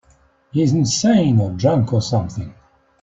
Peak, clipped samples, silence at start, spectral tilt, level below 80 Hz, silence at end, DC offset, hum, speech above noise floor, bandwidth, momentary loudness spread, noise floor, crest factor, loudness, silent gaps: -2 dBFS; under 0.1%; 0.55 s; -6 dB/octave; -50 dBFS; 0.5 s; under 0.1%; none; 39 dB; 8 kHz; 13 LU; -55 dBFS; 16 dB; -17 LUFS; none